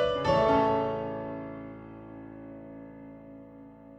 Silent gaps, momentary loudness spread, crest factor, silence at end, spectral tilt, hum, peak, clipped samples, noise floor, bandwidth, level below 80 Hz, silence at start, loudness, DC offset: none; 24 LU; 18 dB; 0 s; -7 dB/octave; none; -12 dBFS; under 0.1%; -49 dBFS; 8.6 kHz; -54 dBFS; 0 s; -28 LUFS; under 0.1%